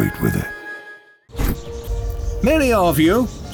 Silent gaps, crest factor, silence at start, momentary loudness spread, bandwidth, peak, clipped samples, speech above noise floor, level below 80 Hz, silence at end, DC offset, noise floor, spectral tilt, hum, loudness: none; 14 dB; 0 s; 18 LU; over 20 kHz; -4 dBFS; under 0.1%; 26 dB; -28 dBFS; 0 s; under 0.1%; -42 dBFS; -6 dB/octave; none; -19 LUFS